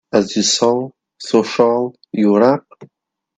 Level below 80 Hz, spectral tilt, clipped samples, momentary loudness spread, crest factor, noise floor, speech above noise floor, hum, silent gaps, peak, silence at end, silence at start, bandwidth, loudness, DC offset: -62 dBFS; -4 dB/octave; under 0.1%; 10 LU; 16 dB; -66 dBFS; 51 dB; none; none; 0 dBFS; 0.5 s; 0.15 s; 9.4 kHz; -16 LUFS; under 0.1%